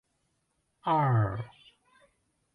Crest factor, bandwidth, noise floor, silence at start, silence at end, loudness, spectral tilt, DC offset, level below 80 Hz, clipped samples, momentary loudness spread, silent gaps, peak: 16 dB; 4.6 kHz; -77 dBFS; 0.85 s; 1.1 s; -29 LUFS; -9 dB/octave; under 0.1%; -60 dBFS; under 0.1%; 15 LU; none; -16 dBFS